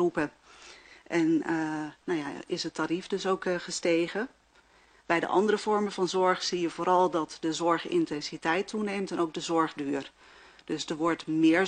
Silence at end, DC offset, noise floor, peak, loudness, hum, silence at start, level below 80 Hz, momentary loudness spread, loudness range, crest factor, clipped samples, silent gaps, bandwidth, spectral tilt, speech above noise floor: 0 s; under 0.1%; -61 dBFS; -10 dBFS; -29 LUFS; none; 0 s; -70 dBFS; 10 LU; 4 LU; 18 dB; under 0.1%; none; 9.6 kHz; -4.5 dB/octave; 33 dB